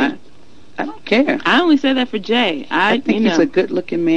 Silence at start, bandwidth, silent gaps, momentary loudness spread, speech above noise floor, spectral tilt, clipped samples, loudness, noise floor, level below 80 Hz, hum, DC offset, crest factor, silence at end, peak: 0 s; 9.4 kHz; none; 10 LU; 32 dB; -5 dB/octave; under 0.1%; -16 LUFS; -47 dBFS; -56 dBFS; none; 2%; 14 dB; 0 s; -2 dBFS